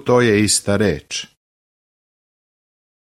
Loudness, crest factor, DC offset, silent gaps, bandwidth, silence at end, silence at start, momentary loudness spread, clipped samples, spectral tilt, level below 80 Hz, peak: -17 LUFS; 18 dB; under 0.1%; none; 16 kHz; 1.8 s; 0.05 s; 13 LU; under 0.1%; -4 dB/octave; -48 dBFS; -2 dBFS